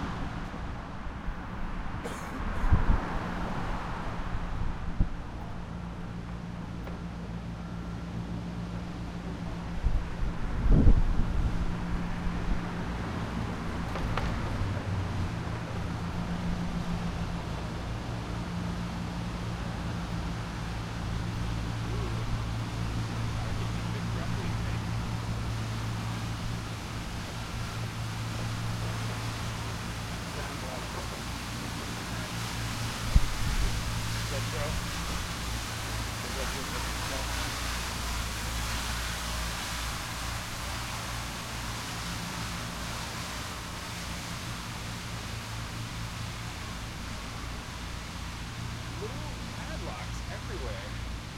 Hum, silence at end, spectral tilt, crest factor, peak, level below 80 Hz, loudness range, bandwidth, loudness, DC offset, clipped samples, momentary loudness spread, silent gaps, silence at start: none; 0 s; -4.5 dB/octave; 24 dB; -8 dBFS; -36 dBFS; 6 LU; 16 kHz; -34 LUFS; under 0.1%; under 0.1%; 6 LU; none; 0 s